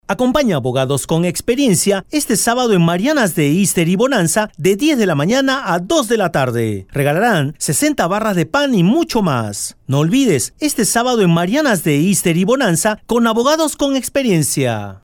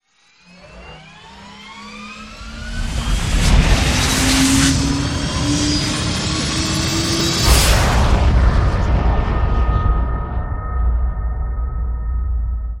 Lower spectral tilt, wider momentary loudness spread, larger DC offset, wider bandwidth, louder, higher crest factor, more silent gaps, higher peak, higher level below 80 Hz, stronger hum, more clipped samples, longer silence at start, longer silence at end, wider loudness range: about the same, -4.5 dB/octave vs -4 dB/octave; second, 4 LU vs 19 LU; neither; first, 19.5 kHz vs 16.5 kHz; about the same, -15 LUFS vs -17 LUFS; about the same, 12 dB vs 16 dB; neither; about the same, -2 dBFS vs 0 dBFS; second, -46 dBFS vs -20 dBFS; neither; neither; second, 0.1 s vs 0.65 s; about the same, 0.05 s vs 0 s; second, 1 LU vs 6 LU